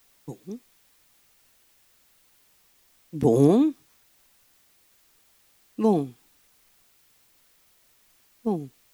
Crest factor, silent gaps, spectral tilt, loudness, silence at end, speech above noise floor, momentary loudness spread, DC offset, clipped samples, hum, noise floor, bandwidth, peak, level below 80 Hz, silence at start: 22 dB; none; -8.5 dB/octave; -23 LUFS; 0.25 s; 41 dB; 24 LU; under 0.1%; under 0.1%; none; -62 dBFS; over 20 kHz; -8 dBFS; -66 dBFS; 0.25 s